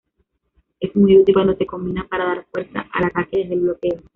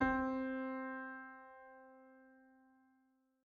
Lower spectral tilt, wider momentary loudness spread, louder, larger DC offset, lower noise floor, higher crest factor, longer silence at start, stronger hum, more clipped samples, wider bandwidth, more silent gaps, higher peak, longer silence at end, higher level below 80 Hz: about the same, -6 dB/octave vs -5 dB/octave; second, 14 LU vs 24 LU; first, -18 LUFS vs -42 LUFS; neither; second, -69 dBFS vs -77 dBFS; second, 16 dB vs 22 dB; first, 0.8 s vs 0 s; neither; neither; second, 4 kHz vs 6.6 kHz; neither; first, -2 dBFS vs -22 dBFS; second, 0.15 s vs 1.1 s; first, -48 dBFS vs -66 dBFS